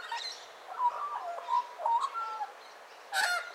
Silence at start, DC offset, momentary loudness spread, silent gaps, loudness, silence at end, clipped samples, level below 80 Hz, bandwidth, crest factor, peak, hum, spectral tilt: 0 s; under 0.1%; 15 LU; none; -33 LUFS; 0 s; under 0.1%; under -90 dBFS; 16 kHz; 18 dB; -16 dBFS; none; 2.5 dB/octave